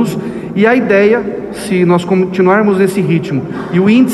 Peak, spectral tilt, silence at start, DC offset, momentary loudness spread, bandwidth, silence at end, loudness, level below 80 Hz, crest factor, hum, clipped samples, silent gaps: 0 dBFS; -7 dB/octave; 0 s; under 0.1%; 10 LU; 13 kHz; 0 s; -12 LUFS; -48 dBFS; 12 dB; none; under 0.1%; none